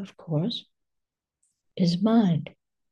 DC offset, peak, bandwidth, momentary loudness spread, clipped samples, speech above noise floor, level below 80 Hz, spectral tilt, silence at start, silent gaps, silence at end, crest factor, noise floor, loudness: under 0.1%; -10 dBFS; 9.2 kHz; 17 LU; under 0.1%; 59 dB; -72 dBFS; -7.5 dB/octave; 0 s; none; 0.45 s; 18 dB; -84 dBFS; -25 LUFS